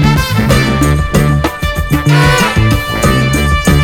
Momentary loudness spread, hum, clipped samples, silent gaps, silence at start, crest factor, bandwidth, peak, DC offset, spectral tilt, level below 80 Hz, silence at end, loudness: 5 LU; none; 0.2%; none; 0 s; 10 dB; 18 kHz; 0 dBFS; under 0.1%; -5.5 dB/octave; -18 dBFS; 0 s; -11 LUFS